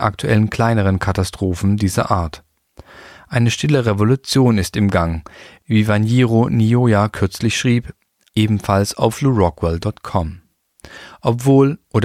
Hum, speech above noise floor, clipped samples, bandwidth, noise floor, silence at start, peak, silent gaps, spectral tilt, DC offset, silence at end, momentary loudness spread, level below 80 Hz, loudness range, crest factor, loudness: none; 28 dB; under 0.1%; 15 kHz; -44 dBFS; 0 s; -2 dBFS; none; -6.5 dB/octave; under 0.1%; 0 s; 9 LU; -38 dBFS; 3 LU; 16 dB; -17 LUFS